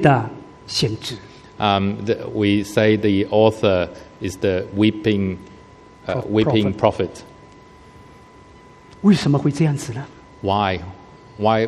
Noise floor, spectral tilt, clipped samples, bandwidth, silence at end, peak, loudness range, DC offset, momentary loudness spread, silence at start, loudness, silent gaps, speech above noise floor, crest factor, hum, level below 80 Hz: -45 dBFS; -6.5 dB/octave; under 0.1%; 13 kHz; 0 s; 0 dBFS; 4 LU; under 0.1%; 14 LU; 0 s; -20 LUFS; none; 27 dB; 20 dB; none; -50 dBFS